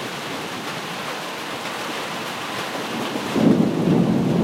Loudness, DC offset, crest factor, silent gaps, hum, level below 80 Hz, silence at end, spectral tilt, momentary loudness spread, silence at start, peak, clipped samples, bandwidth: -23 LUFS; under 0.1%; 18 dB; none; none; -56 dBFS; 0 s; -5.5 dB/octave; 10 LU; 0 s; -4 dBFS; under 0.1%; 16 kHz